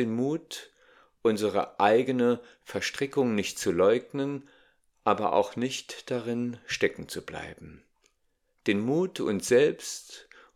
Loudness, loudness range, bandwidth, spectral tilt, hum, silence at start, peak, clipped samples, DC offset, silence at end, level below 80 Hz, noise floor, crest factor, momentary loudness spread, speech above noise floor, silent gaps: -28 LUFS; 5 LU; 15.5 kHz; -4.5 dB/octave; none; 0 s; -8 dBFS; under 0.1%; under 0.1%; 0.35 s; -66 dBFS; -73 dBFS; 20 dB; 16 LU; 45 dB; none